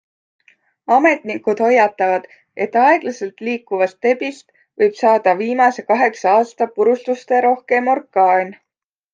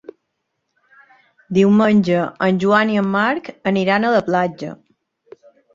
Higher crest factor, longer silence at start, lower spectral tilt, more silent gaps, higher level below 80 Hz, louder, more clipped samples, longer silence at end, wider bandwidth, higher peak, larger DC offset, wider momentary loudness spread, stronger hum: about the same, 16 dB vs 16 dB; second, 0.9 s vs 1.5 s; second, -5 dB/octave vs -7 dB/octave; neither; second, -72 dBFS vs -60 dBFS; about the same, -16 LUFS vs -17 LUFS; neither; second, 0.6 s vs 1 s; about the same, 7.6 kHz vs 7.4 kHz; about the same, -2 dBFS vs -2 dBFS; neither; about the same, 10 LU vs 9 LU; neither